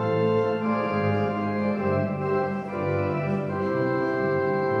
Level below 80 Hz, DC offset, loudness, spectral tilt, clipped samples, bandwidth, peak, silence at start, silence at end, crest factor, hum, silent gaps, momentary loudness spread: -64 dBFS; under 0.1%; -25 LUFS; -9 dB/octave; under 0.1%; 6.8 kHz; -12 dBFS; 0 s; 0 s; 14 dB; none; none; 3 LU